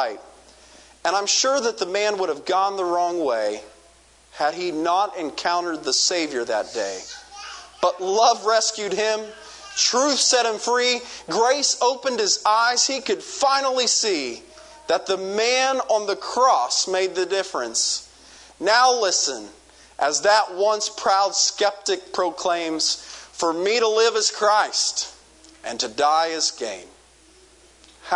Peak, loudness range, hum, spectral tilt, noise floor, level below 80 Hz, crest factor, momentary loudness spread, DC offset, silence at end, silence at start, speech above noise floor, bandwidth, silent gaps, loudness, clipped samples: -4 dBFS; 4 LU; none; -0.5 dB/octave; -53 dBFS; -64 dBFS; 18 dB; 11 LU; under 0.1%; 0 s; 0 s; 32 dB; 11 kHz; none; -21 LUFS; under 0.1%